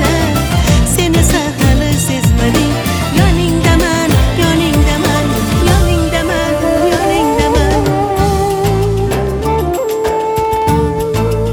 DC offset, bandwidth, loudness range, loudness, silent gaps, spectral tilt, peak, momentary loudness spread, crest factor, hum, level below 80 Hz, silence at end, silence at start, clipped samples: under 0.1%; over 20 kHz; 2 LU; -12 LUFS; none; -5.5 dB/octave; 0 dBFS; 4 LU; 12 dB; none; -18 dBFS; 0 s; 0 s; under 0.1%